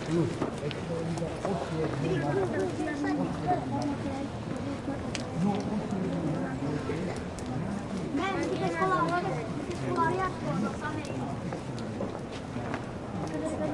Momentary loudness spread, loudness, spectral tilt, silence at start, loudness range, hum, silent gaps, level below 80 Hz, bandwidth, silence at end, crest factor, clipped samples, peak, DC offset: 7 LU; -32 LUFS; -6.5 dB/octave; 0 s; 3 LU; none; none; -52 dBFS; 11.5 kHz; 0 s; 16 dB; under 0.1%; -14 dBFS; under 0.1%